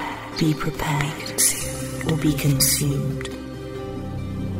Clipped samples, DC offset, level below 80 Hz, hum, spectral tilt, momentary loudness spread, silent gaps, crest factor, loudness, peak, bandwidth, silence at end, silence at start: under 0.1%; under 0.1%; -40 dBFS; none; -4 dB/octave; 14 LU; none; 20 dB; -22 LUFS; -4 dBFS; 16.5 kHz; 0 s; 0 s